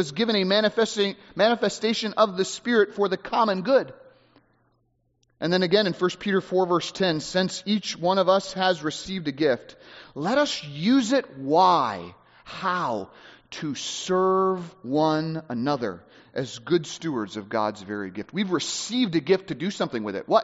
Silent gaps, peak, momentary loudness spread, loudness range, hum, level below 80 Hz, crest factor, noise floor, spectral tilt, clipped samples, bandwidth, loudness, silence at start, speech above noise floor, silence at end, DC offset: none; -6 dBFS; 11 LU; 4 LU; none; -66 dBFS; 20 dB; -69 dBFS; -3.5 dB/octave; under 0.1%; 8 kHz; -24 LUFS; 0 s; 45 dB; 0 s; under 0.1%